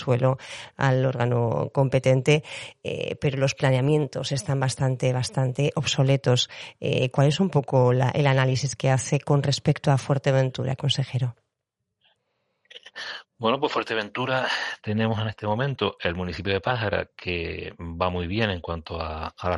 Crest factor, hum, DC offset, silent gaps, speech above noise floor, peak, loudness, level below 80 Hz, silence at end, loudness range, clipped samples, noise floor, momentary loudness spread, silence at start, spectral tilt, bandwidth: 18 dB; none; under 0.1%; none; 58 dB; -6 dBFS; -24 LUFS; -54 dBFS; 0 s; 6 LU; under 0.1%; -82 dBFS; 11 LU; 0 s; -5.5 dB/octave; 11.5 kHz